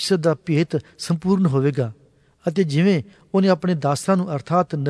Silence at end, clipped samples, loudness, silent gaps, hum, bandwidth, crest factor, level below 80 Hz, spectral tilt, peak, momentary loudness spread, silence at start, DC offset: 0 s; under 0.1%; -21 LUFS; none; none; 11 kHz; 14 dB; -60 dBFS; -6.5 dB/octave; -6 dBFS; 7 LU; 0 s; under 0.1%